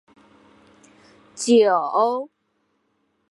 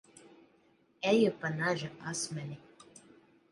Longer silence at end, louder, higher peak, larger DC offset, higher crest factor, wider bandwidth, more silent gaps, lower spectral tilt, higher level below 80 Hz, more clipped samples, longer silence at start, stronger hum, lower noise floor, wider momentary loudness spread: about the same, 1.05 s vs 0.95 s; first, -19 LUFS vs -32 LUFS; first, -6 dBFS vs -16 dBFS; neither; about the same, 18 dB vs 20 dB; about the same, 11.5 kHz vs 11.5 kHz; neither; about the same, -3.5 dB/octave vs -4.5 dB/octave; about the same, -76 dBFS vs -76 dBFS; neither; first, 1.35 s vs 1 s; neither; about the same, -70 dBFS vs -68 dBFS; about the same, 14 LU vs 15 LU